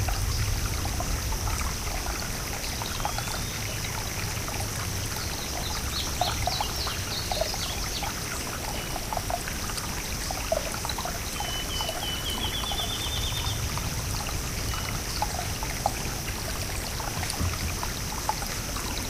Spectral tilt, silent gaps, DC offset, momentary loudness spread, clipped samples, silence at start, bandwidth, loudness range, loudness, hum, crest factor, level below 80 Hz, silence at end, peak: -3 dB/octave; none; under 0.1%; 3 LU; under 0.1%; 0 s; 16 kHz; 2 LU; -29 LUFS; none; 20 dB; -36 dBFS; 0 s; -10 dBFS